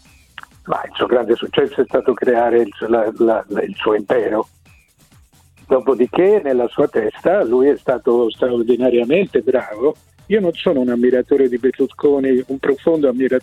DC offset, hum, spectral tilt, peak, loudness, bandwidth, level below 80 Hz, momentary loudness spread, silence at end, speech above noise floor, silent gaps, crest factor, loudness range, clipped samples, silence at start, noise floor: under 0.1%; none; -7 dB/octave; -2 dBFS; -17 LUFS; 9.4 kHz; -54 dBFS; 6 LU; 0 s; 35 dB; none; 14 dB; 3 LU; under 0.1%; 0.65 s; -51 dBFS